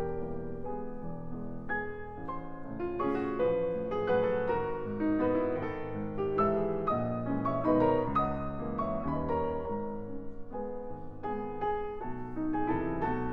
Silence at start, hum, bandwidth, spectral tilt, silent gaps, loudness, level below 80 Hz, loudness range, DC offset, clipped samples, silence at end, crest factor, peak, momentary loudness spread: 0 s; none; 5.4 kHz; -10 dB/octave; none; -33 LUFS; -48 dBFS; 6 LU; under 0.1%; under 0.1%; 0 s; 18 dB; -14 dBFS; 12 LU